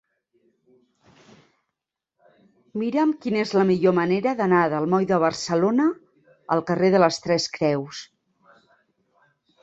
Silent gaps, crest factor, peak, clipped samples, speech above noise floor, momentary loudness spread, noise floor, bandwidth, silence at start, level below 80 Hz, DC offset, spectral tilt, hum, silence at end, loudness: none; 20 dB; -4 dBFS; under 0.1%; 63 dB; 9 LU; -84 dBFS; 8.2 kHz; 2.75 s; -66 dBFS; under 0.1%; -6 dB/octave; none; 1.6 s; -22 LUFS